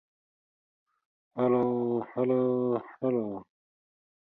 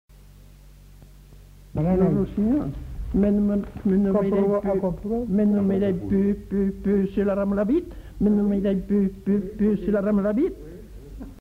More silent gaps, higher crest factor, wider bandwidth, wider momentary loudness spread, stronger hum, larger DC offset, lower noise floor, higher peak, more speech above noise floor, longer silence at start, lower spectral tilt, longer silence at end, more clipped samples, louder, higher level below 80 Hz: neither; about the same, 16 dB vs 14 dB; about the same, 4 kHz vs 4.2 kHz; about the same, 10 LU vs 9 LU; neither; neither; first, under -90 dBFS vs -47 dBFS; second, -16 dBFS vs -8 dBFS; first, over 62 dB vs 26 dB; first, 1.35 s vs 0.65 s; about the same, -11 dB/octave vs -10 dB/octave; first, 0.9 s vs 0 s; neither; second, -29 LUFS vs -23 LUFS; second, -74 dBFS vs -40 dBFS